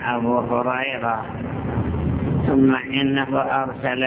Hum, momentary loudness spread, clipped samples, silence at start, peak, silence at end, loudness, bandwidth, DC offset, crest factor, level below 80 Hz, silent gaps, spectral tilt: none; 8 LU; under 0.1%; 0 s; -6 dBFS; 0 s; -21 LUFS; 4 kHz; under 0.1%; 16 dB; -36 dBFS; none; -10.5 dB/octave